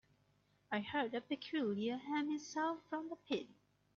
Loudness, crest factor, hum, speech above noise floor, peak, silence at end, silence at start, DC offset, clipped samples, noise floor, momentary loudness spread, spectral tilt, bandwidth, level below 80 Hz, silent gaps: -41 LUFS; 16 dB; 50 Hz at -75 dBFS; 35 dB; -26 dBFS; 0.45 s; 0.7 s; under 0.1%; under 0.1%; -76 dBFS; 6 LU; -3 dB/octave; 7.4 kHz; -82 dBFS; none